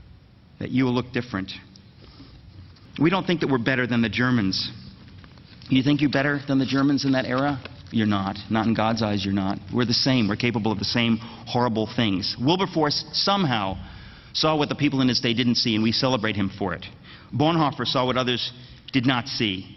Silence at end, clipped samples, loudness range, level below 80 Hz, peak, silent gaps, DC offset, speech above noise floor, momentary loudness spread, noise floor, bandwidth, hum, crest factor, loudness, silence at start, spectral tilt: 0 s; under 0.1%; 2 LU; -52 dBFS; -6 dBFS; none; under 0.1%; 27 dB; 10 LU; -50 dBFS; 6.4 kHz; none; 18 dB; -23 LUFS; 0.6 s; -6 dB/octave